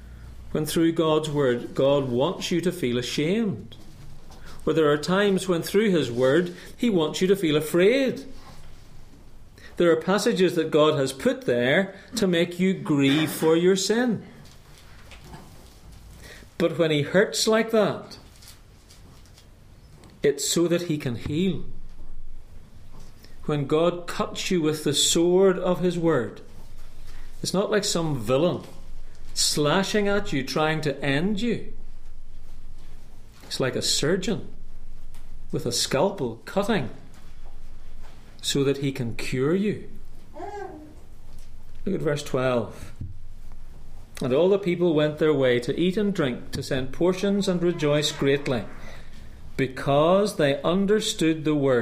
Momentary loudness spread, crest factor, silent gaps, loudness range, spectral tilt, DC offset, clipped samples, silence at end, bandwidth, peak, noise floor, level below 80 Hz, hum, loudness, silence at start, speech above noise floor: 15 LU; 18 dB; none; 6 LU; -5 dB/octave; under 0.1%; under 0.1%; 0 s; 15.5 kHz; -6 dBFS; -49 dBFS; -40 dBFS; none; -24 LUFS; 0 s; 26 dB